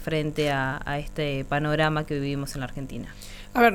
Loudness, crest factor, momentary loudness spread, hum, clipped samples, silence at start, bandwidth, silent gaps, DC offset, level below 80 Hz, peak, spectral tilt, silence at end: -27 LUFS; 20 dB; 13 LU; none; under 0.1%; 0 s; 18 kHz; none; under 0.1%; -42 dBFS; -6 dBFS; -6 dB/octave; 0 s